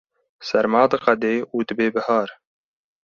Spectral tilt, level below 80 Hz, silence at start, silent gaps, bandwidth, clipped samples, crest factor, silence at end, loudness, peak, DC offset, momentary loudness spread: -6 dB/octave; -64 dBFS; 0.4 s; none; 7.2 kHz; under 0.1%; 20 dB; 0.7 s; -20 LUFS; -2 dBFS; under 0.1%; 8 LU